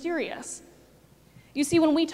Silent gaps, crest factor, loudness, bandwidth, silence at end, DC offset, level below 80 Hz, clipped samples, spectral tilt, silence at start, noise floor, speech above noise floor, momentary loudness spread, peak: none; 16 dB; -26 LUFS; 14 kHz; 0 s; under 0.1%; -62 dBFS; under 0.1%; -4 dB/octave; 0 s; -57 dBFS; 32 dB; 17 LU; -12 dBFS